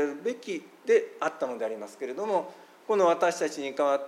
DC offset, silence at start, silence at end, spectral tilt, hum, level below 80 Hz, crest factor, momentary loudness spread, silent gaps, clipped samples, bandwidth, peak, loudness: under 0.1%; 0 s; 0 s; -4 dB/octave; none; under -90 dBFS; 18 dB; 13 LU; none; under 0.1%; 14 kHz; -12 dBFS; -29 LUFS